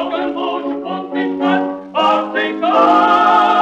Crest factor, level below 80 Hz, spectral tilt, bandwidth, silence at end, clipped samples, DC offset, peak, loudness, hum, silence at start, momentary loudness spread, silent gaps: 14 dB; -58 dBFS; -5.5 dB/octave; 8.6 kHz; 0 s; under 0.1%; under 0.1%; 0 dBFS; -15 LUFS; none; 0 s; 11 LU; none